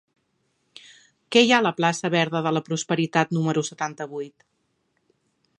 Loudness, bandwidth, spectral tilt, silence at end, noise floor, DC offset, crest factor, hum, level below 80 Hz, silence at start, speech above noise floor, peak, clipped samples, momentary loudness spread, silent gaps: -22 LUFS; 11 kHz; -4.5 dB/octave; 1.3 s; -72 dBFS; under 0.1%; 22 dB; none; -74 dBFS; 1.3 s; 49 dB; -2 dBFS; under 0.1%; 15 LU; none